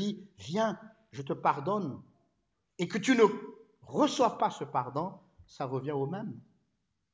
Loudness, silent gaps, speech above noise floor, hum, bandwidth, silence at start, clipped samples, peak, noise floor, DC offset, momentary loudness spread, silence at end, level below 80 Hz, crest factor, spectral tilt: -31 LUFS; none; 49 dB; none; 8 kHz; 0 s; under 0.1%; -12 dBFS; -80 dBFS; under 0.1%; 18 LU; 0.75 s; -72 dBFS; 20 dB; -5.5 dB/octave